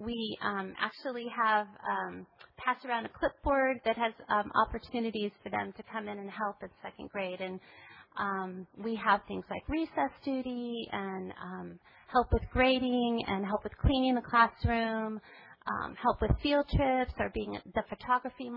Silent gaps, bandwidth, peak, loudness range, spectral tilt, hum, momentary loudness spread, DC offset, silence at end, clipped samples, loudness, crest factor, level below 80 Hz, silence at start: none; 5.6 kHz; -10 dBFS; 7 LU; -9 dB/octave; none; 13 LU; under 0.1%; 0 s; under 0.1%; -32 LUFS; 22 dB; -46 dBFS; 0 s